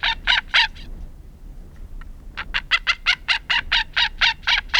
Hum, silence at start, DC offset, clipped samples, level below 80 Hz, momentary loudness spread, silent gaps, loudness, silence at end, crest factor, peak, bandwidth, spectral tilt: none; 0 s; under 0.1%; under 0.1%; -36 dBFS; 16 LU; none; -19 LUFS; 0 s; 20 dB; -2 dBFS; 17 kHz; -0.5 dB/octave